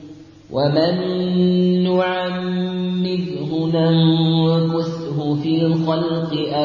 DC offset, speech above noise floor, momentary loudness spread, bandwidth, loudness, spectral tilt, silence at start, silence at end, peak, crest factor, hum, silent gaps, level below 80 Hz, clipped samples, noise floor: under 0.1%; 22 dB; 7 LU; 6.8 kHz; -19 LUFS; -8.5 dB/octave; 0 s; 0 s; -4 dBFS; 14 dB; none; none; -56 dBFS; under 0.1%; -40 dBFS